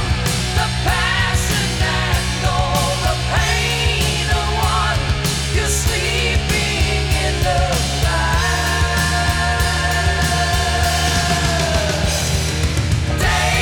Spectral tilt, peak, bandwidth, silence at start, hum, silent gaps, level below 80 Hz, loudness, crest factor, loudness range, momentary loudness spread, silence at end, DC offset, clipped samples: -3.5 dB/octave; -6 dBFS; 19.5 kHz; 0 s; none; none; -22 dBFS; -17 LUFS; 12 dB; 1 LU; 2 LU; 0 s; under 0.1%; under 0.1%